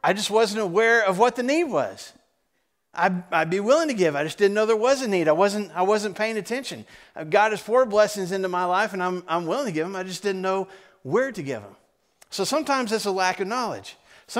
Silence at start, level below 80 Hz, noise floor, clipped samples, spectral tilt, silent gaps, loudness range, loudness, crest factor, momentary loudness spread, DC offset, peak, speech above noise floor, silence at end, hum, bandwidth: 0.05 s; -70 dBFS; -74 dBFS; under 0.1%; -4 dB/octave; none; 5 LU; -23 LUFS; 20 dB; 13 LU; under 0.1%; -4 dBFS; 51 dB; 0 s; none; 16 kHz